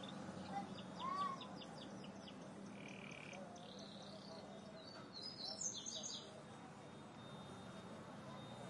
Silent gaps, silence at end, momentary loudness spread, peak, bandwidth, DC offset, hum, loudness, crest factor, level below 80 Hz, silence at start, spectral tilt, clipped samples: none; 0 s; 11 LU; -32 dBFS; 11.5 kHz; under 0.1%; none; -50 LUFS; 20 dB; -84 dBFS; 0 s; -3 dB/octave; under 0.1%